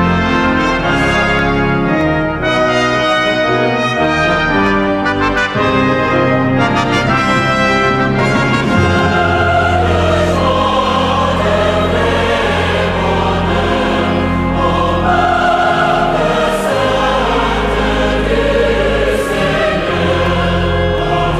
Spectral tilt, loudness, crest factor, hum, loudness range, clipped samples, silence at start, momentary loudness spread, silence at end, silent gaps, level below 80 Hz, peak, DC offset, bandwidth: -6 dB/octave; -13 LUFS; 12 dB; none; 1 LU; under 0.1%; 0 s; 2 LU; 0 s; none; -26 dBFS; 0 dBFS; under 0.1%; 14 kHz